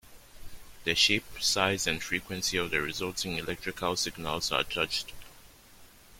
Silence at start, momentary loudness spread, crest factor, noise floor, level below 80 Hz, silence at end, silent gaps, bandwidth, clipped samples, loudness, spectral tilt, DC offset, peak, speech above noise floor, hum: 0.05 s; 9 LU; 24 dB; -54 dBFS; -54 dBFS; 0 s; none; 16.5 kHz; under 0.1%; -29 LUFS; -2 dB/octave; under 0.1%; -8 dBFS; 24 dB; none